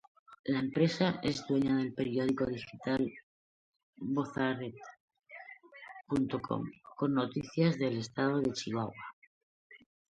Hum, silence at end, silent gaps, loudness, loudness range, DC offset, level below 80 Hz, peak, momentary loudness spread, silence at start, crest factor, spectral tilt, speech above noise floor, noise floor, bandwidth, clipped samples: none; 0.3 s; 0.39-0.44 s, 3.23-3.73 s, 3.83-3.93 s, 5.00-5.08 s, 9.13-9.70 s; -34 LUFS; 6 LU; under 0.1%; -66 dBFS; -14 dBFS; 20 LU; 0.3 s; 20 dB; -6.5 dB/octave; 20 dB; -52 dBFS; 9.2 kHz; under 0.1%